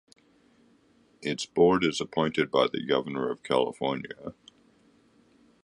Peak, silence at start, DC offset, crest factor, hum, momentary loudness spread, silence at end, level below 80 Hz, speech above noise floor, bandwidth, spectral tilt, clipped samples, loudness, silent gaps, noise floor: -10 dBFS; 1.2 s; under 0.1%; 20 dB; none; 14 LU; 1.35 s; -64 dBFS; 36 dB; 11 kHz; -5 dB/octave; under 0.1%; -27 LUFS; none; -63 dBFS